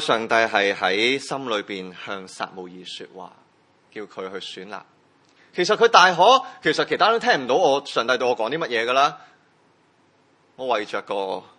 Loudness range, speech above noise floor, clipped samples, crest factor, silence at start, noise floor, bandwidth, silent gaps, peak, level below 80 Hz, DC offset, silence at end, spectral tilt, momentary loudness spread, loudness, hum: 16 LU; 39 dB; under 0.1%; 22 dB; 0 s; -60 dBFS; 11 kHz; none; 0 dBFS; -76 dBFS; under 0.1%; 0.2 s; -3 dB/octave; 20 LU; -20 LUFS; none